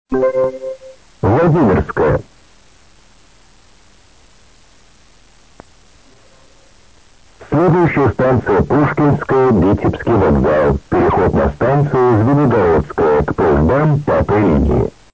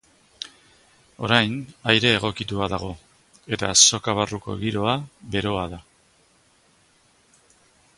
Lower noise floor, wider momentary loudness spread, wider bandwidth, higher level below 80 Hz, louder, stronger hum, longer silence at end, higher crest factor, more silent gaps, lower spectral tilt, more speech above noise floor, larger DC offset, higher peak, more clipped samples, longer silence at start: second, -48 dBFS vs -60 dBFS; second, 4 LU vs 23 LU; second, 8 kHz vs 11.5 kHz; first, -30 dBFS vs -50 dBFS; first, -14 LUFS vs -21 LUFS; neither; second, 0.25 s vs 2.15 s; second, 12 dB vs 26 dB; neither; first, -9.5 dB/octave vs -2.5 dB/octave; about the same, 36 dB vs 37 dB; first, 0.4% vs under 0.1%; second, -4 dBFS vs 0 dBFS; neither; second, 0.1 s vs 0.4 s